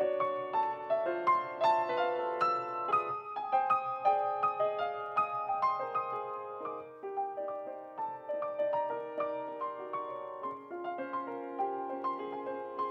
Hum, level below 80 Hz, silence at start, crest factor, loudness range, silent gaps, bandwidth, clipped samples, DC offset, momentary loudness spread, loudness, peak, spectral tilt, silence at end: none; -88 dBFS; 0 s; 18 dB; 7 LU; none; 8.4 kHz; under 0.1%; under 0.1%; 11 LU; -34 LUFS; -16 dBFS; -6 dB/octave; 0 s